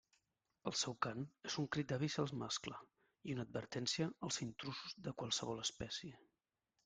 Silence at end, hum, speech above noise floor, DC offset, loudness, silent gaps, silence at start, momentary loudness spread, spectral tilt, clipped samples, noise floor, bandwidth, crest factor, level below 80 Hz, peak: 0.7 s; none; 46 dB; under 0.1%; -43 LUFS; none; 0.65 s; 8 LU; -3.5 dB/octave; under 0.1%; -89 dBFS; 9.6 kHz; 24 dB; -74 dBFS; -22 dBFS